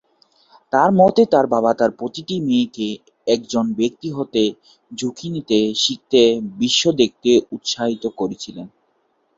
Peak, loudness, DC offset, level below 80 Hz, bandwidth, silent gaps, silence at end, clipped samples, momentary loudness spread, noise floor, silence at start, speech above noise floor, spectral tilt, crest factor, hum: -2 dBFS; -18 LUFS; under 0.1%; -58 dBFS; 7.8 kHz; none; 0.7 s; under 0.1%; 12 LU; -65 dBFS; 0.75 s; 47 dB; -4.5 dB/octave; 18 dB; none